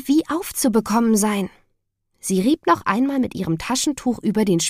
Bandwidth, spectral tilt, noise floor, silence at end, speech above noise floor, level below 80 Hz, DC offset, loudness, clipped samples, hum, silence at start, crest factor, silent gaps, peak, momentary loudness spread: 15.5 kHz; -4.5 dB/octave; -70 dBFS; 0 s; 51 dB; -52 dBFS; under 0.1%; -20 LUFS; under 0.1%; none; 0 s; 16 dB; none; -4 dBFS; 7 LU